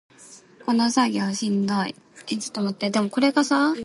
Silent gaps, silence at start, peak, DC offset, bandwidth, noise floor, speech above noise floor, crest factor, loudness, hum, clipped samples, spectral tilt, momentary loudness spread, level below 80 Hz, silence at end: none; 0.2 s; -6 dBFS; under 0.1%; 11.5 kHz; -49 dBFS; 26 dB; 18 dB; -23 LUFS; none; under 0.1%; -4.5 dB/octave; 11 LU; -70 dBFS; 0 s